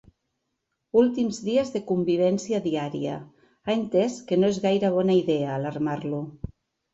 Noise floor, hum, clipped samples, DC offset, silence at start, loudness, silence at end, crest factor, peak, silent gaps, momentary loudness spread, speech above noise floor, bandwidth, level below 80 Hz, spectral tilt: -79 dBFS; none; under 0.1%; under 0.1%; 0.95 s; -25 LUFS; 0.55 s; 18 dB; -8 dBFS; none; 11 LU; 55 dB; 8.2 kHz; -58 dBFS; -6.5 dB/octave